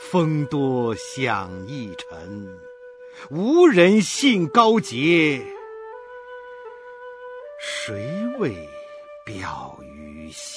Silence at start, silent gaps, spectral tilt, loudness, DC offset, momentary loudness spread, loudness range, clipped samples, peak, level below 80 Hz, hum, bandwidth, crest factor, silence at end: 0 s; none; -5 dB/octave; -20 LUFS; under 0.1%; 23 LU; 13 LU; under 0.1%; -2 dBFS; -58 dBFS; none; 11 kHz; 20 dB; 0 s